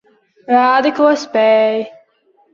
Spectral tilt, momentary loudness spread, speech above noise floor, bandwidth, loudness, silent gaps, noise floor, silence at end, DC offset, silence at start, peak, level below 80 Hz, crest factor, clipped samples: -4.5 dB/octave; 8 LU; 43 dB; 7.2 kHz; -13 LUFS; none; -56 dBFS; 0.65 s; under 0.1%; 0.5 s; -2 dBFS; -66 dBFS; 14 dB; under 0.1%